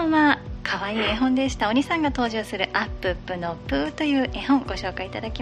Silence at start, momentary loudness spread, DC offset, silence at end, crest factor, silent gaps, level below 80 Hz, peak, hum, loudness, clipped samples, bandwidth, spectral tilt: 0 s; 8 LU; under 0.1%; 0 s; 18 dB; none; -40 dBFS; -6 dBFS; 60 Hz at -40 dBFS; -24 LUFS; under 0.1%; 11.5 kHz; -5 dB/octave